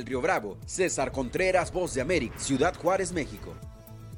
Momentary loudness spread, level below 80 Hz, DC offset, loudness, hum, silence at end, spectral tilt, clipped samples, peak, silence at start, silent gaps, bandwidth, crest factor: 17 LU; -46 dBFS; under 0.1%; -28 LUFS; none; 0 s; -4.5 dB/octave; under 0.1%; -12 dBFS; 0 s; none; 17 kHz; 18 dB